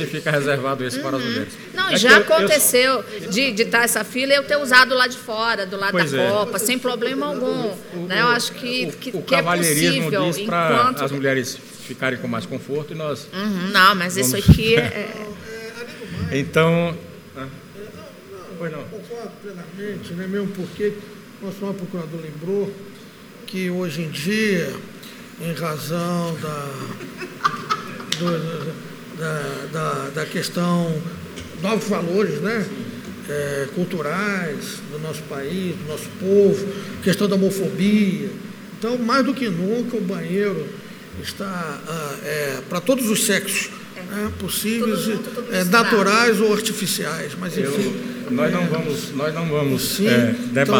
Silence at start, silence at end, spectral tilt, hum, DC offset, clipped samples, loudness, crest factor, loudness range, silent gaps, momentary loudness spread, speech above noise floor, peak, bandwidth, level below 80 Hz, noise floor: 0 s; 0 s; -4 dB/octave; none; under 0.1%; under 0.1%; -20 LUFS; 22 dB; 10 LU; none; 17 LU; 20 dB; 0 dBFS; over 20 kHz; -44 dBFS; -41 dBFS